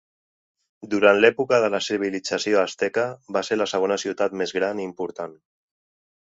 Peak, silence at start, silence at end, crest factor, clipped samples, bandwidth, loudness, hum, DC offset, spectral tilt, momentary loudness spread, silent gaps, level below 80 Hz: -2 dBFS; 0.8 s; 0.85 s; 22 dB; under 0.1%; 8 kHz; -22 LUFS; none; under 0.1%; -4 dB/octave; 12 LU; none; -68 dBFS